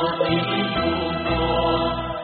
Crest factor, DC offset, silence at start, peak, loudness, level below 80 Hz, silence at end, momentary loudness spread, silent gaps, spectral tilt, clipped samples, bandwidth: 14 dB; under 0.1%; 0 s; -8 dBFS; -22 LUFS; -36 dBFS; 0 s; 3 LU; none; -3.5 dB/octave; under 0.1%; 4.7 kHz